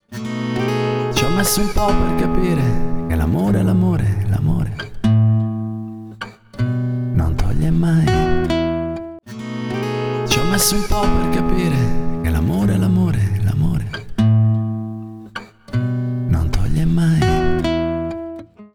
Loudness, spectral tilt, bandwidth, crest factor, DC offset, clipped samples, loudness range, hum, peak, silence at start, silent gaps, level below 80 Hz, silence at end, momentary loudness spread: -18 LUFS; -6 dB/octave; 19 kHz; 14 dB; under 0.1%; under 0.1%; 2 LU; none; -2 dBFS; 0.1 s; none; -26 dBFS; 0.1 s; 13 LU